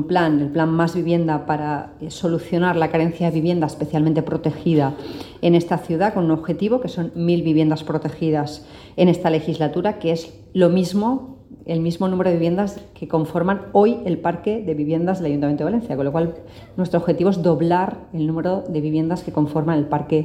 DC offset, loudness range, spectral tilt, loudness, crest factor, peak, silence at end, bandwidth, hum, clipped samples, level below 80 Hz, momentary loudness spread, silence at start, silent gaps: under 0.1%; 1 LU; -8 dB/octave; -20 LUFS; 16 dB; -4 dBFS; 0 s; 11.5 kHz; none; under 0.1%; -50 dBFS; 9 LU; 0 s; none